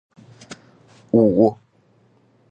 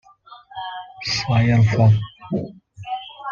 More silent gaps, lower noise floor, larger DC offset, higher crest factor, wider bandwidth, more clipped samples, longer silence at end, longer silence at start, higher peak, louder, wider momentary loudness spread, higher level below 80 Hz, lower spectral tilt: neither; first, -58 dBFS vs -46 dBFS; neither; about the same, 18 dB vs 16 dB; first, 8.8 kHz vs 7.2 kHz; neither; first, 0.95 s vs 0 s; first, 0.5 s vs 0.3 s; about the same, -4 dBFS vs -4 dBFS; first, -17 LUFS vs -20 LUFS; first, 26 LU vs 19 LU; second, -58 dBFS vs -48 dBFS; first, -9 dB/octave vs -6.5 dB/octave